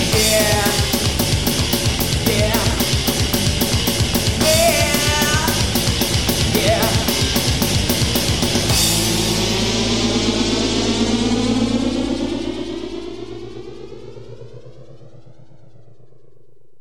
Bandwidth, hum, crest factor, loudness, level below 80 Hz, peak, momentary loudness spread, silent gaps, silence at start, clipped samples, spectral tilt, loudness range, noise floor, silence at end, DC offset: 19.5 kHz; none; 16 dB; -17 LUFS; -30 dBFS; -2 dBFS; 15 LU; none; 0 s; under 0.1%; -3.5 dB/octave; 11 LU; -56 dBFS; 1.7 s; 1%